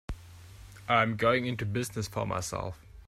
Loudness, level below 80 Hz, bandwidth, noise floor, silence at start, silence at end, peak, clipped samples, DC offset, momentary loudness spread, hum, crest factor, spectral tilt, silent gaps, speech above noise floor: -30 LUFS; -50 dBFS; 16 kHz; -49 dBFS; 0.1 s; 0.05 s; -12 dBFS; under 0.1%; under 0.1%; 20 LU; none; 20 dB; -5 dB/octave; none; 20 dB